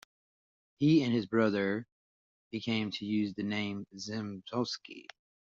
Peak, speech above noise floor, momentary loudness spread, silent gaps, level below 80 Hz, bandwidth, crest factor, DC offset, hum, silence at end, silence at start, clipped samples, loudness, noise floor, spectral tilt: -14 dBFS; over 58 dB; 14 LU; 1.92-2.51 s; -74 dBFS; 7.6 kHz; 18 dB; under 0.1%; none; 0.5 s; 0.8 s; under 0.1%; -33 LUFS; under -90 dBFS; -5 dB/octave